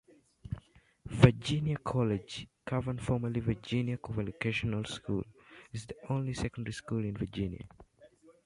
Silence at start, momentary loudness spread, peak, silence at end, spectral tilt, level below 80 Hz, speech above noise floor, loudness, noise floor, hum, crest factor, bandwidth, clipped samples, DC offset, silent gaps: 0.45 s; 15 LU; -6 dBFS; 0.15 s; -7 dB/octave; -52 dBFS; 26 dB; -33 LUFS; -61 dBFS; none; 28 dB; 11.5 kHz; under 0.1%; under 0.1%; none